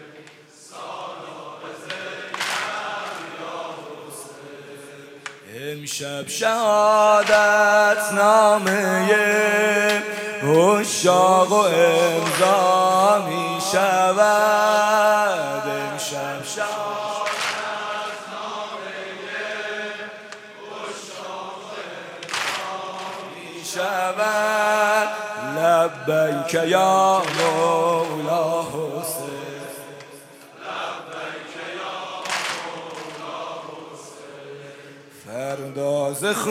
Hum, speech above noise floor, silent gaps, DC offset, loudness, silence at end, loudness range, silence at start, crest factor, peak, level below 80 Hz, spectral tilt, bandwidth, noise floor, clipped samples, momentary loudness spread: none; 29 dB; none; under 0.1%; -20 LUFS; 0 s; 14 LU; 0 s; 18 dB; -4 dBFS; -72 dBFS; -3 dB/octave; 16.5 kHz; -46 dBFS; under 0.1%; 20 LU